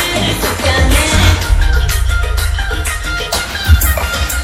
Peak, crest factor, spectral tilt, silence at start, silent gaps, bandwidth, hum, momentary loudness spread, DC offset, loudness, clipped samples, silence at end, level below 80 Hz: 0 dBFS; 12 dB; -3.5 dB/octave; 0 s; none; 17.5 kHz; none; 6 LU; under 0.1%; -13 LUFS; 0.3%; 0 s; -16 dBFS